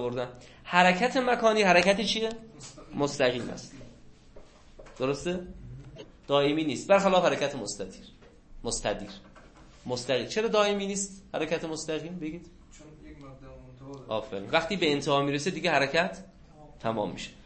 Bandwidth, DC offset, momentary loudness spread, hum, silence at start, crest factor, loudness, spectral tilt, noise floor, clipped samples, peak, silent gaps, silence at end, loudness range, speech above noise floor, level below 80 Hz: 8.8 kHz; under 0.1%; 24 LU; none; 0 s; 24 dB; -27 LUFS; -4 dB/octave; -52 dBFS; under 0.1%; -6 dBFS; none; 0.15 s; 9 LU; 24 dB; -54 dBFS